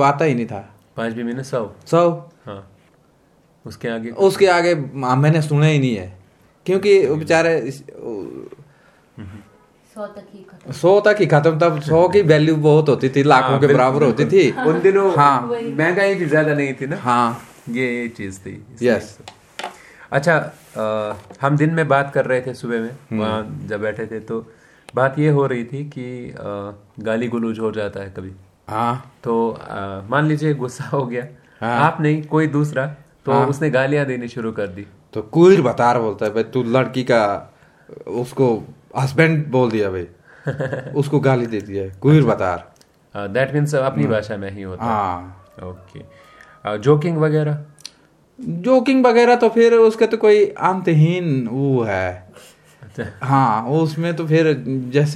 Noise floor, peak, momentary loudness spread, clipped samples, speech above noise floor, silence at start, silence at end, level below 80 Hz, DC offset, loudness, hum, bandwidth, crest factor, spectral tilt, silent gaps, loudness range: -55 dBFS; 0 dBFS; 17 LU; under 0.1%; 38 dB; 0 s; 0 s; -58 dBFS; under 0.1%; -18 LUFS; none; 12 kHz; 18 dB; -7 dB/octave; none; 8 LU